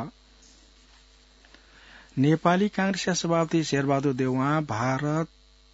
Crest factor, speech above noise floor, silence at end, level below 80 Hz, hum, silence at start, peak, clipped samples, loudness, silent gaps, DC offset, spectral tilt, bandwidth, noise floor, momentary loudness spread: 20 dB; 31 dB; 0.5 s; -58 dBFS; none; 0 s; -6 dBFS; under 0.1%; -25 LUFS; none; under 0.1%; -5.5 dB/octave; 8 kHz; -56 dBFS; 7 LU